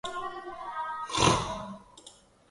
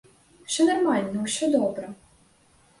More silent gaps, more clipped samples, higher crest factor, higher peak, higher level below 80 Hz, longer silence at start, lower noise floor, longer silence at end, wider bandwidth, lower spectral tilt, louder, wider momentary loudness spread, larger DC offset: neither; neither; first, 22 dB vs 16 dB; about the same, -10 dBFS vs -10 dBFS; first, -50 dBFS vs -66 dBFS; second, 0.05 s vs 0.5 s; second, -56 dBFS vs -60 dBFS; second, 0.4 s vs 0.85 s; about the same, 11.5 kHz vs 11.5 kHz; about the same, -3.5 dB/octave vs -4 dB/octave; second, -30 LUFS vs -24 LUFS; first, 23 LU vs 17 LU; neither